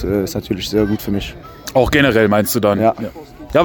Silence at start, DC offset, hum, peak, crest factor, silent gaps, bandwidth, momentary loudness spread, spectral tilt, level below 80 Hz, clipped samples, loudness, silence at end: 0 s; under 0.1%; none; 0 dBFS; 16 dB; none; over 20 kHz; 16 LU; -5.5 dB/octave; -36 dBFS; under 0.1%; -16 LUFS; 0 s